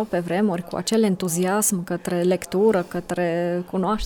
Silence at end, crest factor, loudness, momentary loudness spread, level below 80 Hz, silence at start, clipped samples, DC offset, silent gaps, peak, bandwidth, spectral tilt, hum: 0 s; 16 dB; -22 LUFS; 6 LU; -48 dBFS; 0 s; under 0.1%; under 0.1%; none; -6 dBFS; 18.5 kHz; -5 dB/octave; none